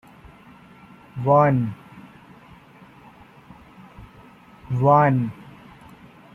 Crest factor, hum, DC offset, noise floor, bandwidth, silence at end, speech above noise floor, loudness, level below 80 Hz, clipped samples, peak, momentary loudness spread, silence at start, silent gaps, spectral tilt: 22 dB; none; under 0.1%; -48 dBFS; 5.8 kHz; 0.85 s; 31 dB; -20 LUFS; -56 dBFS; under 0.1%; -2 dBFS; 23 LU; 1.15 s; none; -10 dB/octave